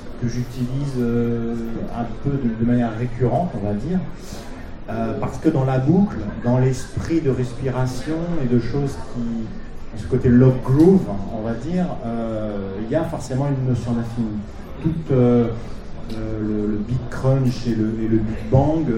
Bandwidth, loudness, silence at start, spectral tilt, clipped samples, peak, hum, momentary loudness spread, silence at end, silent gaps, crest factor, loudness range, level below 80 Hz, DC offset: 11 kHz; -21 LUFS; 0 s; -8.5 dB/octave; under 0.1%; -2 dBFS; none; 12 LU; 0 s; none; 18 dB; 5 LU; -34 dBFS; under 0.1%